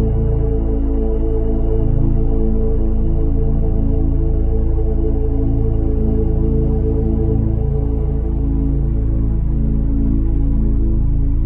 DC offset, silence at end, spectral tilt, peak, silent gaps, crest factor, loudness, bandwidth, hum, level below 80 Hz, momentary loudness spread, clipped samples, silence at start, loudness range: under 0.1%; 0 s; -13 dB/octave; -4 dBFS; none; 10 dB; -19 LUFS; 2 kHz; none; -16 dBFS; 2 LU; under 0.1%; 0 s; 1 LU